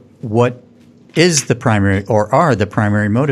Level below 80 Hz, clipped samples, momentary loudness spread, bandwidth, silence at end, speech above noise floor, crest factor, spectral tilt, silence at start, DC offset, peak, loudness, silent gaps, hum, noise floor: -50 dBFS; under 0.1%; 4 LU; 13.5 kHz; 0 s; 31 dB; 14 dB; -5 dB/octave; 0.25 s; under 0.1%; 0 dBFS; -15 LUFS; none; none; -45 dBFS